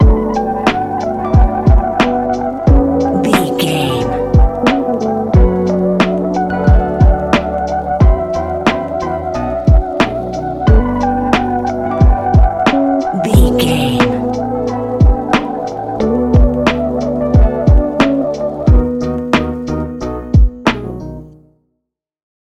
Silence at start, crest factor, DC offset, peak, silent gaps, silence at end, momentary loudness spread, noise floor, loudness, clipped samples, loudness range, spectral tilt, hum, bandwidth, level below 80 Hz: 0 s; 12 dB; 0.2%; 0 dBFS; none; 1.2 s; 7 LU; -74 dBFS; -14 LUFS; under 0.1%; 2 LU; -7 dB/octave; none; 13.5 kHz; -16 dBFS